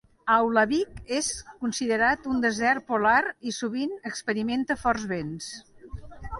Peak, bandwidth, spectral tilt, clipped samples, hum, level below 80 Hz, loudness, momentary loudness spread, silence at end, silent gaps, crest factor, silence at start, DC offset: -8 dBFS; 11.5 kHz; -3.5 dB/octave; under 0.1%; none; -50 dBFS; -26 LUFS; 15 LU; 0 s; none; 18 dB; 0.25 s; under 0.1%